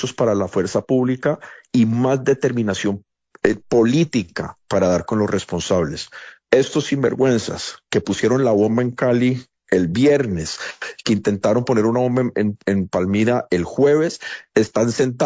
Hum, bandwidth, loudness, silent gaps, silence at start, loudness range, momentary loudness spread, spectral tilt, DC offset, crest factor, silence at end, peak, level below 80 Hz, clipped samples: none; 8 kHz; -19 LUFS; none; 0 s; 2 LU; 10 LU; -6 dB/octave; under 0.1%; 16 dB; 0 s; -2 dBFS; -46 dBFS; under 0.1%